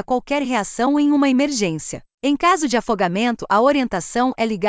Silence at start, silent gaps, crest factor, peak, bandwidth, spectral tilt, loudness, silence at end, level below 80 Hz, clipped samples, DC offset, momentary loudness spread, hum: 0.1 s; 2.14-2.18 s; 14 dB; -4 dBFS; 8 kHz; -4.5 dB/octave; -19 LUFS; 0 s; -52 dBFS; under 0.1%; under 0.1%; 6 LU; none